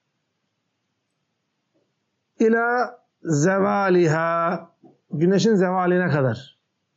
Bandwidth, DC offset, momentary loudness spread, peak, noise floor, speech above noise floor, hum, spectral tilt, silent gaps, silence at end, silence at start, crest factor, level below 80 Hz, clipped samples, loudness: 8 kHz; under 0.1%; 11 LU; -8 dBFS; -75 dBFS; 56 dB; none; -6 dB/octave; none; 0.5 s; 2.4 s; 14 dB; -72 dBFS; under 0.1%; -20 LUFS